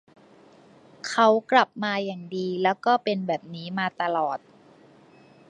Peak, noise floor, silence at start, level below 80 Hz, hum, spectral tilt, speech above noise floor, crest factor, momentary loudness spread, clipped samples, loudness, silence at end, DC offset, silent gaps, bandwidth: -4 dBFS; -54 dBFS; 1.05 s; -78 dBFS; none; -5 dB/octave; 29 dB; 22 dB; 11 LU; under 0.1%; -25 LUFS; 1.1 s; under 0.1%; none; 10.5 kHz